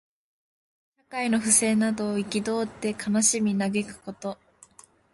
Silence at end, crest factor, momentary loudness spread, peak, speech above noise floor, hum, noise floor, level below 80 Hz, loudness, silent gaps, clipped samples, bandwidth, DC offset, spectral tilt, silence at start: 0.8 s; 22 dB; 17 LU; -6 dBFS; 30 dB; none; -55 dBFS; -64 dBFS; -24 LUFS; none; under 0.1%; 11.5 kHz; under 0.1%; -3.5 dB/octave; 1.1 s